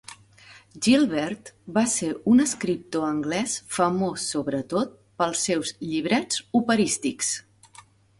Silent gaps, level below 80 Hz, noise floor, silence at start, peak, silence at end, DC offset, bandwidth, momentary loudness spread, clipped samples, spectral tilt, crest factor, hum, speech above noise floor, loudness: none; -62 dBFS; -53 dBFS; 0.1 s; -8 dBFS; 0.8 s; under 0.1%; 11.5 kHz; 9 LU; under 0.1%; -3.5 dB/octave; 18 dB; none; 28 dB; -24 LUFS